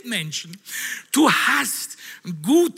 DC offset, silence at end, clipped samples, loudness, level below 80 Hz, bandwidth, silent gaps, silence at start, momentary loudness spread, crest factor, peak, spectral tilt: under 0.1%; 0 s; under 0.1%; -21 LUFS; -78 dBFS; 16 kHz; none; 0.05 s; 16 LU; 18 dB; -4 dBFS; -3 dB/octave